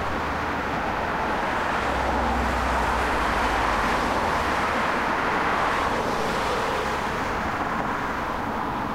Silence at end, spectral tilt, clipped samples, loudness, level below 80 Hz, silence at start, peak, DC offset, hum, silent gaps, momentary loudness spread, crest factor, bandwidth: 0 s; -4.5 dB/octave; under 0.1%; -24 LUFS; -36 dBFS; 0 s; -12 dBFS; 0.2%; none; none; 4 LU; 14 dB; 16 kHz